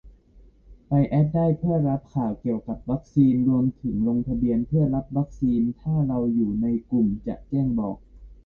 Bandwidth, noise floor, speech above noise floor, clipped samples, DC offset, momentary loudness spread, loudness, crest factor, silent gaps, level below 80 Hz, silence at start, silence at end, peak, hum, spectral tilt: 4.1 kHz; -53 dBFS; 30 dB; under 0.1%; under 0.1%; 8 LU; -24 LUFS; 16 dB; none; -44 dBFS; 0.05 s; 0.1 s; -8 dBFS; none; -12 dB/octave